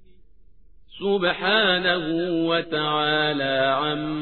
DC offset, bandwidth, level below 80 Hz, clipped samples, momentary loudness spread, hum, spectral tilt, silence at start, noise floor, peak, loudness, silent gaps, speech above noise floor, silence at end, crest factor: 0.4%; 4.5 kHz; -56 dBFS; under 0.1%; 6 LU; none; -7.5 dB/octave; 0.9 s; -55 dBFS; -6 dBFS; -22 LUFS; none; 32 dB; 0 s; 18 dB